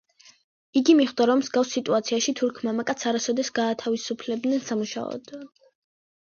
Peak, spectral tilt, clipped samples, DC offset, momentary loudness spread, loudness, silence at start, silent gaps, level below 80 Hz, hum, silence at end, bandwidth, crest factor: -6 dBFS; -3.5 dB/octave; under 0.1%; under 0.1%; 11 LU; -24 LUFS; 0.75 s; none; -72 dBFS; none; 0.8 s; 7.4 kHz; 18 dB